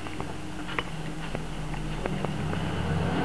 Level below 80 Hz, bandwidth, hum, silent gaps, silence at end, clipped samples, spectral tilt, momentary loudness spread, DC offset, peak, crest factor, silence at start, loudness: -42 dBFS; 11 kHz; none; none; 0 s; under 0.1%; -6 dB/octave; 7 LU; 1%; -10 dBFS; 20 dB; 0 s; -33 LUFS